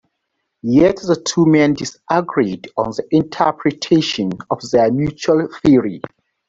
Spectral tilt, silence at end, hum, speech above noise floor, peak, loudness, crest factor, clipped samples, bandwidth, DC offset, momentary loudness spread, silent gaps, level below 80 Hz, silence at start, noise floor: -6 dB/octave; 0.4 s; none; 58 dB; -2 dBFS; -16 LUFS; 14 dB; under 0.1%; 7.8 kHz; under 0.1%; 9 LU; none; -48 dBFS; 0.65 s; -73 dBFS